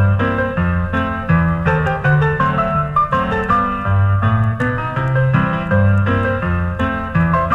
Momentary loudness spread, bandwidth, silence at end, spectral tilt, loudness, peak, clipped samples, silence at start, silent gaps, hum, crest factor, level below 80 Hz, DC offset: 4 LU; 5 kHz; 0 s; -9 dB/octave; -16 LUFS; -2 dBFS; under 0.1%; 0 s; none; none; 14 dB; -32 dBFS; under 0.1%